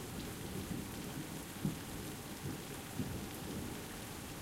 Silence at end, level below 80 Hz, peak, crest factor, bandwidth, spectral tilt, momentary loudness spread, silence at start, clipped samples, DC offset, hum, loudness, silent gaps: 0 s; -58 dBFS; -24 dBFS; 20 dB; 16 kHz; -4.5 dB/octave; 4 LU; 0 s; under 0.1%; under 0.1%; none; -44 LUFS; none